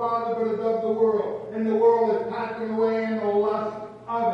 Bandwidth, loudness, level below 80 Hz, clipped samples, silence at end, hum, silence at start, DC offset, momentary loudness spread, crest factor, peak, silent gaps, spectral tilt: 6 kHz; -24 LUFS; -66 dBFS; under 0.1%; 0 s; none; 0 s; under 0.1%; 10 LU; 14 dB; -10 dBFS; none; -8 dB/octave